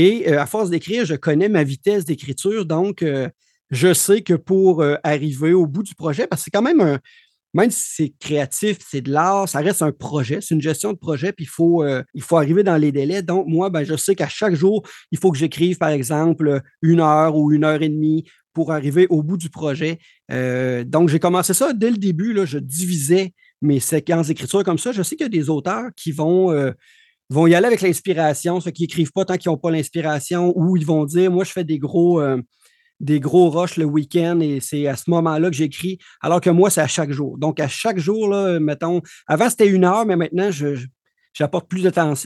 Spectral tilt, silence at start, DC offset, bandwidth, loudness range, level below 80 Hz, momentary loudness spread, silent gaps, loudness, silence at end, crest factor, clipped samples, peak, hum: -5.5 dB/octave; 0 s; under 0.1%; 12.5 kHz; 2 LU; -68 dBFS; 9 LU; none; -18 LUFS; 0 s; 16 dB; under 0.1%; -2 dBFS; none